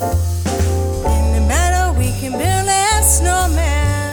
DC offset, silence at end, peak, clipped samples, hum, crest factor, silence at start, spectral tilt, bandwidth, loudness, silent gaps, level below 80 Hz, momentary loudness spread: under 0.1%; 0 s; 0 dBFS; under 0.1%; none; 14 dB; 0 s; -4 dB/octave; over 20 kHz; -15 LUFS; none; -18 dBFS; 7 LU